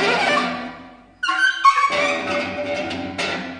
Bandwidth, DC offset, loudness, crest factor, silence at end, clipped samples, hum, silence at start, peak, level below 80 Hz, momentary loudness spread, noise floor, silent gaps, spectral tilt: 10 kHz; under 0.1%; -19 LUFS; 20 dB; 0 s; under 0.1%; none; 0 s; -2 dBFS; -58 dBFS; 11 LU; -42 dBFS; none; -3 dB/octave